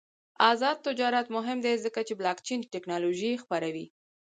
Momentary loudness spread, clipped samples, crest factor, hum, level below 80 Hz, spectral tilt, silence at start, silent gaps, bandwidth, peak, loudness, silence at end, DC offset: 10 LU; under 0.1%; 22 dB; none; -80 dBFS; -3.5 dB/octave; 0.4 s; none; 9.4 kHz; -8 dBFS; -29 LUFS; 0.45 s; under 0.1%